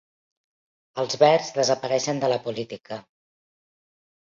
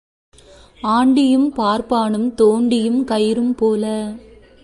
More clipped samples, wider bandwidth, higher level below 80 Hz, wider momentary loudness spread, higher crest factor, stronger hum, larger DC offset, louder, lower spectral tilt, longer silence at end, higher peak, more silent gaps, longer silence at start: neither; second, 7.8 kHz vs 11.5 kHz; second, -72 dBFS vs -50 dBFS; first, 18 LU vs 10 LU; first, 22 dB vs 14 dB; neither; neither; second, -23 LUFS vs -17 LUFS; second, -3.5 dB/octave vs -6 dB/octave; first, 1.25 s vs 0.45 s; about the same, -4 dBFS vs -4 dBFS; neither; about the same, 0.95 s vs 0.85 s